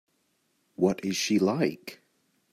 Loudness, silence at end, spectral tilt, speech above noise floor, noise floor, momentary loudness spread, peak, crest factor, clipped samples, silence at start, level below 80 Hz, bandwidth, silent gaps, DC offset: -27 LUFS; 0.6 s; -5 dB/octave; 46 dB; -73 dBFS; 15 LU; -12 dBFS; 18 dB; under 0.1%; 0.8 s; -70 dBFS; 15.5 kHz; none; under 0.1%